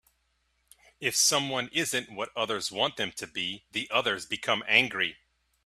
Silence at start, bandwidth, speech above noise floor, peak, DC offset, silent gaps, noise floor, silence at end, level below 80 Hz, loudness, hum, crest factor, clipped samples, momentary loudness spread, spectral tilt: 1 s; 15.5 kHz; 44 dB; -6 dBFS; under 0.1%; none; -73 dBFS; 0.55 s; -68 dBFS; -27 LUFS; none; 26 dB; under 0.1%; 10 LU; -1 dB/octave